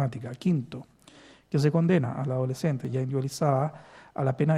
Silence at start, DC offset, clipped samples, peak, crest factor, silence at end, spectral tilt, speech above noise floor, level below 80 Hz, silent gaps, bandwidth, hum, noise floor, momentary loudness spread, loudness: 0 s; under 0.1%; under 0.1%; -10 dBFS; 18 dB; 0 s; -7.5 dB/octave; 27 dB; -66 dBFS; none; 13.5 kHz; none; -54 dBFS; 8 LU; -28 LUFS